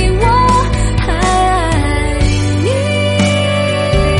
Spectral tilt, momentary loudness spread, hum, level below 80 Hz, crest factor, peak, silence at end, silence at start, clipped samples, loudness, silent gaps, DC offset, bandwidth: -5.5 dB/octave; 4 LU; none; -18 dBFS; 12 dB; 0 dBFS; 0 s; 0 s; under 0.1%; -13 LUFS; none; under 0.1%; 11.5 kHz